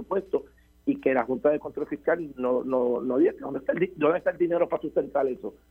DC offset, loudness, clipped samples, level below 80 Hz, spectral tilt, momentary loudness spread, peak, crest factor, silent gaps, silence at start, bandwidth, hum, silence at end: under 0.1%; -27 LUFS; under 0.1%; -60 dBFS; -9 dB/octave; 7 LU; -8 dBFS; 18 dB; none; 0 s; 4.2 kHz; none; 0.2 s